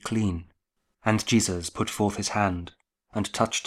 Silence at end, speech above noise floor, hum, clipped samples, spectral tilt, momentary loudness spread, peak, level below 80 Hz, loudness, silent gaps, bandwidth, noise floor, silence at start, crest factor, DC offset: 0 s; 49 dB; none; under 0.1%; -4.5 dB/octave; 13 LU; -6 dBFS; -52 dBFS; -27 LUFS; none; 15 kHz; -75 dBFS; 0.05 s; 22 dB; under 0.1%